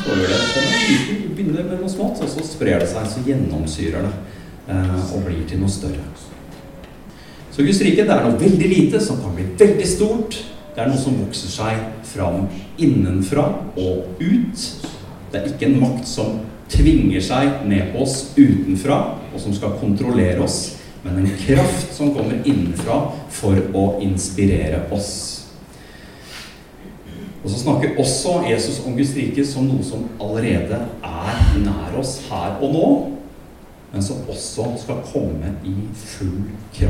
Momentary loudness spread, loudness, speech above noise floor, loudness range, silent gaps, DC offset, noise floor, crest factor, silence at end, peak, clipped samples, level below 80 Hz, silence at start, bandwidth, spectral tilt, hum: 16 LU; -19 LUFS; 23 dB; 7 LU; none; under 0.1%; -41 dBFS; 18 dB; 0 s; 0 dBFS; under 0.1%; -32 dBFS; 0 s; 15.5 kHz; -5.5 dB/octave; none